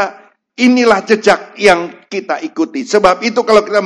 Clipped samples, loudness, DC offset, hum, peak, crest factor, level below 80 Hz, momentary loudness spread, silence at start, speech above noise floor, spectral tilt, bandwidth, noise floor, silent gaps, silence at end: 0.4%; -12 LUFS; under 0.1%; none; 0 dBFS; 12 dB; -48 dBFS; 10 LU; 0 s; 23 dB; -4 dB/octave; 11 kHz; -35 dBFS; none; 0 s